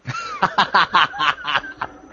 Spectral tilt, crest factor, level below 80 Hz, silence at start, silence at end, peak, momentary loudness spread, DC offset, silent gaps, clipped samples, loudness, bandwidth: -3 dB/octave; 20 dB; -54 dBFS; 0.05 s; 0.15 s; 0 dBFS; 14 LU; under 0.1%; none; under 0.1%; -18 LUFS; 7.6 kHz